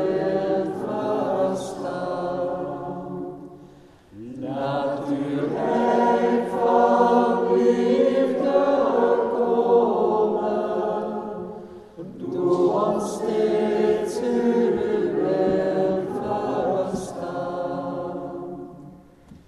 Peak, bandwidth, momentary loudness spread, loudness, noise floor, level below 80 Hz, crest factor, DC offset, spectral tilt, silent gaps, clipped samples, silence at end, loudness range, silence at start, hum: -6 dBFS; 12 kHz; 14 LU; -22 LUFS; -49 dBFS; -58 dBFS; 18 dB; under 0.1%; -7 dB/octave; none; under 0.1%; 0.1 s; 9 LU; 0 s; none